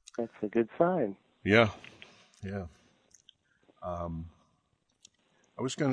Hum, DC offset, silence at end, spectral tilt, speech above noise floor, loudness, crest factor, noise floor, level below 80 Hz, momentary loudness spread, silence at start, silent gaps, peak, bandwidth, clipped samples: none; under 0.1%; 0 s; -6 dB/octave; 45 dB; -31 LUFS; 26 dB; -75 dBFS; -60 dBFS; 23 LU; 0.2 s; none; -8 dBFS; 10 kHz; under 0.1%